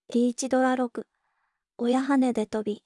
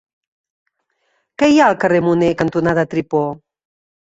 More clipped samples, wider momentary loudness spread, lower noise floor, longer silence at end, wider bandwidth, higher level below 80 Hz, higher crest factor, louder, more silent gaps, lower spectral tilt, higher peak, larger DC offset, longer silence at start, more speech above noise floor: neither; about the same, 8 LU vs 8 LU; first, -77 dBFS vs -67 dBFS; second, 0.05 s vs 0.75 s; first, 11.5 kHz vs 8 kHz; second, -72 dBFS vs -52 dBFS; about the same, 16 dB vs 16 dB; second, -26 LUFS vs -15 LUFS; neither; second, -4.5 dB/octave vs -6.5 dB/octave; second, -12 dBFS vs -2 dBFS; neither; second, 0.1 s vs 1.4 s; about the same, 52 dB vs 52 dB